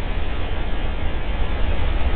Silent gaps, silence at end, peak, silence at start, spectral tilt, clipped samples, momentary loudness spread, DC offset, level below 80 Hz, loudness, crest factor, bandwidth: none; 0 s; -6 dBFS; 0 s; -9.5 dB/octave; under 0.1%; 3 LU; under 0.1%; -22 dBFS; -27 LUFS; 12 dB; 4.3 kHz